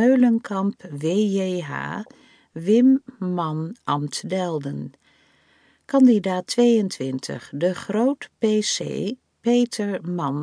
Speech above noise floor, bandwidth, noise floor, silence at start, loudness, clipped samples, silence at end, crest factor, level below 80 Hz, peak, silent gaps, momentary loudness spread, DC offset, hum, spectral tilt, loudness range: 38 dB; 10.5 kHz; -60 dBFS; 0 s; -22 LUFS; under 0.1%; 0 s; 16 dB; -72 dBFS; -6 dBFS; none; 13 LU; under 0.1%; none; -5.5 dB/octave; 3 LU